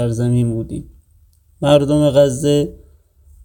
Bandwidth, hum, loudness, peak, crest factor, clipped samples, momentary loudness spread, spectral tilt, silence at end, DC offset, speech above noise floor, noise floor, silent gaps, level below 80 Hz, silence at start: 18.5 kHz; none; -16 LUFS; 0 dBFS; 16 dB; under 0.1%; 13 LU; -7 dB/octave; 0.7 s; under 0.1%; 37 dB; -52 dBFS; none; -42 dBFS; 0 s